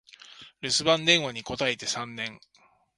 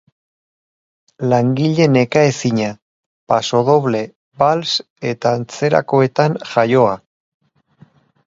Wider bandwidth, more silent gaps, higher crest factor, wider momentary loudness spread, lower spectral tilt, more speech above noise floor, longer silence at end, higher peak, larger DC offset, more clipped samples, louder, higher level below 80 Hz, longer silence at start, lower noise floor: first, 11.5 kHz vs 7.8 kHz; second, none vs 2.82-3.27 s, 4.16-4.32 s, 4.90-4.96 s; first, 24 dB vs 18 dB; first, 15 LU vs 8 LU; second, -2.5 dB/octave vs -6 dB/octave; second, 23 dB vs 35 dB; second, 0.6 s vs 1.3 s; second, -6 dBFS vs 0 dBFS; neither; neither; second, -25 LUFS vs -16 LUFS; about the same, -62 dBFS vs -58 dBFS; second, 0.3 s vs 1.2 s; about the same, -50 dBFS vs -50 dBFS